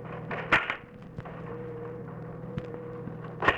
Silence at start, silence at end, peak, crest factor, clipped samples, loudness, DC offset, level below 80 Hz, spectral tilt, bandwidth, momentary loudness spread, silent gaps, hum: 0 s; 0 s; -8 dBFS; 26 dB; under 0.1%; -33 LUFS; under 0.1%; -54 dBFS; -6 dB/octave; 11.5 kHz; 15 LU; none; none